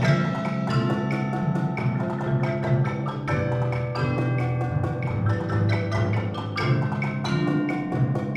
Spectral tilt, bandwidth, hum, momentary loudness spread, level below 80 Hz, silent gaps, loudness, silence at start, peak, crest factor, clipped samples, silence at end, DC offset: -8 dB/octave; 9 kHz; none; 3 LU; -48 dBFS; none; -25 LUFS; 0 s; -6 dBFS; 18 dB; under 0.1%; 0 s; under 0.1%